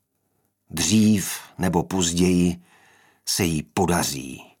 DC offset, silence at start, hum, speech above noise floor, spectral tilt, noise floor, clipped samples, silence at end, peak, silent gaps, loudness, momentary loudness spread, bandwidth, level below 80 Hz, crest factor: under 0.1%; 0.7 s; none; 49 dB; -4.5 dB/octave; -71 dBFS; under 0.1%; 0.15 s; -6 dBFS; none; -22 LUFS; 15 LU; 18 kHz; -48 dBFS; 18 dB